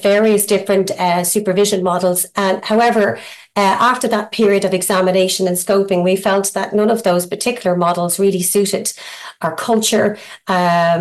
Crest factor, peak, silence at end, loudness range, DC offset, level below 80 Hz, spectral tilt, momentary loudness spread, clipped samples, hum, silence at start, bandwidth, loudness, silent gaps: 14 dB; -2 dBFS; 0 s; 2 LU; under 0.1%; -60 dBFS; -4 dB/octave; 6 LU; under 0.1%; none; 0 s; 13 kHz; -15 LUFS; none